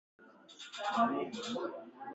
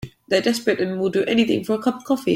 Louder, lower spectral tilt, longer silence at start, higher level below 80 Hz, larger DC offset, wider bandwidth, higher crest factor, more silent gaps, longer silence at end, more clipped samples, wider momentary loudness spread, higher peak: second, -36 LUFS vs -21 LUFS; about the same, -4 dB/octave vs -5 dB/octave; first, 0.2 s vs 0 s; second, -84 dBFS vs -56 dBFS; neither; second, 8.2 kHz vs 16.5 kHz; about the same, 20 dB vs 16 dB; neither; about the same, 0 s vs 0 s; neither; first, 17 LU vs 4 LU; second, -18 dBFS vs -4 dBFS